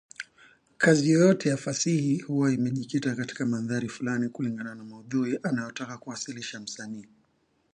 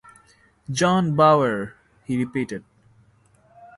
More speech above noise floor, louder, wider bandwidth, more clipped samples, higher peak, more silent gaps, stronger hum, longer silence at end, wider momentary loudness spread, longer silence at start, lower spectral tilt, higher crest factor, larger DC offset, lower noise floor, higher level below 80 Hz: first, 43 dB vs 38 dB; second, -27 LUFS vs -21 LUFS; about the same, 10.5 kHz vs 11.5 kHz; neither; second, -8 dBFS vs -4 dBFS; neither; neither; second, 0.7 s vs 1.2 s; second, 17 LU vs 20 LU; second, 0.2 s vs 0.7 s; about the same, -5.5 dB/octave vs -6 dB/octave; about the same, 20 dB vs 20 dB; neither; first, -70 dBFS vs -58 dBFS; second, -70 dBFS vs -58 dBFS